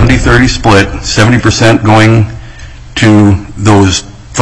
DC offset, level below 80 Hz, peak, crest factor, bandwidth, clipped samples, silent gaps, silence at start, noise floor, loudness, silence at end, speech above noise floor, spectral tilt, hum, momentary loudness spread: under 0.1%; -20 dBFS; 0 dBFS; 8 dB; 11 kHz; 1%; none; 0 s; -27 dBFS; -7 LUFS; 0 s; 21 dB; -5.5 dB/octave; none; 10 LU